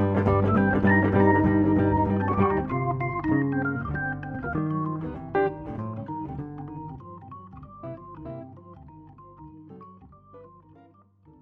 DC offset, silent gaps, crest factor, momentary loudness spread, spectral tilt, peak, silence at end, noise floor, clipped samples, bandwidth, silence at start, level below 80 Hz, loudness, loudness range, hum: under 0.1%; none; 20 dB; 23 LU; -11 dB/octave; -6 dBFS; 0.95 s; -56 dBFS; under 0.1%; 4.2 kHz; 0 s; -46 dBFS; -25 LUFS; 21 LU; none